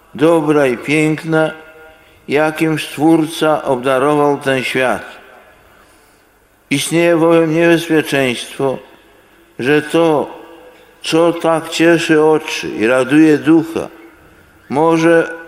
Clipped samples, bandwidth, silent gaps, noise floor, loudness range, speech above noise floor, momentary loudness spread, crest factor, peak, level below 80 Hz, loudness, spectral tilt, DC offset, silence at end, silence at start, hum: under 0.1%; 15 kHz; none; -51 dBFS; 4 LU; 38 dB; 9 LU; 14 dB; 0 dBFS; -54 dBFS; -13 LUFS; -5.5 dB/octave; under 0.1%; 0 s; 0.15 s; none